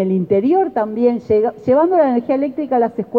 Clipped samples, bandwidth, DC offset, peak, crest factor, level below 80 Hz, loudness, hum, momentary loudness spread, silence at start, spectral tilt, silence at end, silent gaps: under 0.1%; 5 kHz; under 0.1%; -4 dBFS; 12 dB; -56 dBFS; -16 LUFS; none; 5 LU; 0 s; -10 dB/octave; 0 s; none